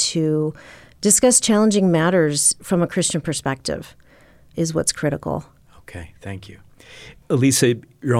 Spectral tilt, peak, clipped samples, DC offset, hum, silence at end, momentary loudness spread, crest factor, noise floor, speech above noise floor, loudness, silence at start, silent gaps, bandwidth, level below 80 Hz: -4 dB/octave; -4 dBFS; under 0.1%; under 0.1%; none; 0 s; 20 LU; 16 dB; -50 dBFS; 31 dB; -18 LUFS; 0 s; none; 16 kHz; -50 dBFS